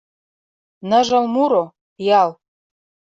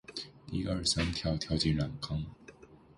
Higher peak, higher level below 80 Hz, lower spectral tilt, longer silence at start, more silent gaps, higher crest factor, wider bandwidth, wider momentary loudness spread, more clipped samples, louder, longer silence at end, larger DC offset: first, -2 dBFS vs -16 dBFS; second, -64 dBFS vs -46 dBFS; about the same, -5 dB/octave vs -4.5 dB/octave; first, 0.85 s vs 0.1 s; first, 1.81-1.96 s vs none; about the same, 16 dB vs 18 dB; second, 8 kHz vs 11.5 kHz; about the same, 12 LU vs 12 LU; neither; first, -17 LUFS vs -33 LUFS; first, 0.85 s vs 0.2 s; neither